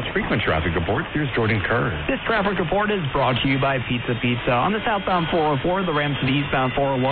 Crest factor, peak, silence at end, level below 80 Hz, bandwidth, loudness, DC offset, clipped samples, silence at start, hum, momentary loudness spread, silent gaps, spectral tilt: 12 dB; -10 dBFS; 0 s; -38 dBFS; 4.6 kHz; -21 LUFS; under 0.1%; under 0.1%; 0 s; none; 3 LU; none; -4 dB/octave